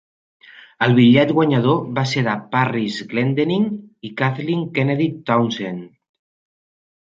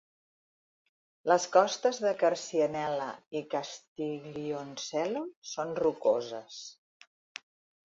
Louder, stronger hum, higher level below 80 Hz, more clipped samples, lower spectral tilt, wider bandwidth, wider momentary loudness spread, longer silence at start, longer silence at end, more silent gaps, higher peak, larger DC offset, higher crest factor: first, -18 LUFS vs -31 LUFS; neither; first, -60 dBFS vs -76 dBFS; neither; first, -7 dB/octave vs -4 dB/octave; about the same, 7.6 kHz vs 7.8 kHz; second, 10 LU vs 18 LU; second, 0.8 s vs 1.25 s; about the same, 1.15 s vs 1.25 s; second, none vs 3.27-3.31 s, 3.88-3.96 s, 5.37-5.42 s; first, -2 dBFS vs -10 dBFS; neither; about the same, 18 dB vs 22 dB